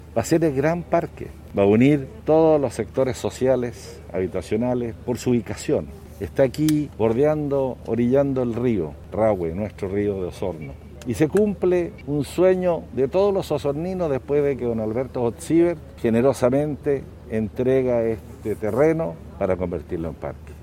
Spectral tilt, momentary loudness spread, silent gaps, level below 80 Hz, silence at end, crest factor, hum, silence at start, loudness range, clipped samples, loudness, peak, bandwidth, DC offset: -7 dB/octave; 11 LU; none; -44 dBFS; 0 s; 18 dB; none; 0 s; 3 LU; under 0.1%; -22 LUFS; -4 dBFS; 16.5 kHz; under 0.1%